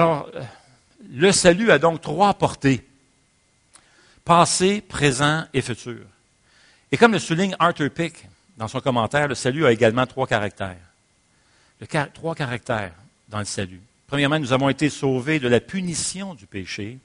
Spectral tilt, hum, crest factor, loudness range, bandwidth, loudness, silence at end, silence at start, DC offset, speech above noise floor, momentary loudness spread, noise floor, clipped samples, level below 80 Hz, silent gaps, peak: -4.5 dB/octave; none; 22 dB; 7 LU; 10.5 kHz; -21 LUFS; 0.05 s; 0 s; under 0.1%; 41 dB; 16 LU; -62 dBFS; under 0.1%; -52 dBFS; none; 0 dBFS